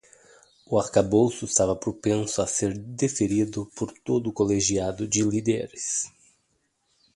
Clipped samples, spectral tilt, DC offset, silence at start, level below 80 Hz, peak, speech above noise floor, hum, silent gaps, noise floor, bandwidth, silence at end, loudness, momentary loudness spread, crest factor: under 0.1%; -4.5 dB/octave; under 0.1%; 0.7 s; -52 dBFS; -6 dBFS; 47 dB; none; none; -72 dBFS; 11.5 kHz; 1.05 s; -25 LUFS; 7 LU; 20 dB